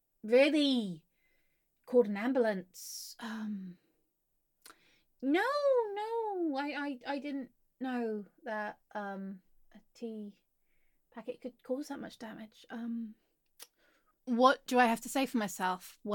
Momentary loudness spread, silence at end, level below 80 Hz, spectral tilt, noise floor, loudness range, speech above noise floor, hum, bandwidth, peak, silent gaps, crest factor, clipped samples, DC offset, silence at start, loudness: 20 LU; 0 s; -76 dBFS; -4.5 dB/octave; -80 dBFS; 12 LU; 46 dB; none; 17.5 kHz; -12 dBFS; none; 24 dB; under 0.1%; under 0.1%; 0.25 s; -33 LUFS